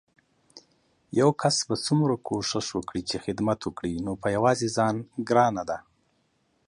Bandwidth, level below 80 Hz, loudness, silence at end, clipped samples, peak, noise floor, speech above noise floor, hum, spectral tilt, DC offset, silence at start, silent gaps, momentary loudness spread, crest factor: 11.5 kHz; -56 dBFS; -26 LUFS; 0.9 s; under 0.1%; -8 dBFS; -70 dBFS; 44 dB; none; -5 dB/octave; under 0.1%; 0.55 s; none; 9 LU; 18 dB